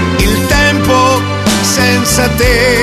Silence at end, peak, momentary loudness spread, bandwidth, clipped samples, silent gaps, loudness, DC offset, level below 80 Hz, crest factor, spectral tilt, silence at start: 0 s; 0 dBFS; 2 LU; 14.5 kHz; under 0.1%; none; -10 LUFS; under 0.1%; -20 dBFS; 10 dB; -4 dB/octave; 0 s